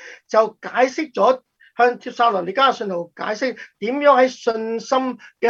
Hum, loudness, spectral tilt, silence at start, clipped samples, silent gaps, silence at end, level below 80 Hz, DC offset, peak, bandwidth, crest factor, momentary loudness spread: none; -19 LUFS; -4 dB/octave; 0 s; under 0.1%; none; 0 s; -74 dBFS; under 0.1%; -2 dBFS; 7.6 kHz; 18 dB; 11 LU